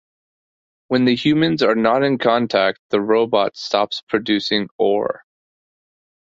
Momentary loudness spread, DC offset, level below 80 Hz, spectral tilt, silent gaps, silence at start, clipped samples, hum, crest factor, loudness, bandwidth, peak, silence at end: 6 LU; under 0.1%; -60 dBFS; -6 dB/octave; 2.79-2.90 s, 4.03-4.07 s, 4.71-4.79 s; 0.9 s; under 0.1%; none; 18 dB; -18 LUFS; 7.8 kHz; -2 dBFS; 1.15 s